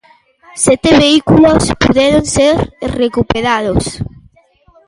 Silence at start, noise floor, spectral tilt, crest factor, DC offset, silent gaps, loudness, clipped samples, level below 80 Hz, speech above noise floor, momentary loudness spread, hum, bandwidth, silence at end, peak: 0.55 s; -49 dBFS; -4.5 dB/octave; 12 dB; under 0.1%; none; -11 LUFS; under 0.1%; -30 dBFS; 39 dB; 12 LU; none; 11.5 kHz; 0.8 s; 0 dBFS